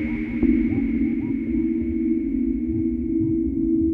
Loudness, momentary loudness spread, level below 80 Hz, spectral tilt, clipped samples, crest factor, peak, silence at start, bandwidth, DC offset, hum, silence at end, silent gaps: -23 LUFS; 3 LU; -36 dBFS; -11 dB/octave; under 0.1%; 16 dB; -6 dBFS; 0 s; 3.4 kHz; under 0.1%; none; 0 s; none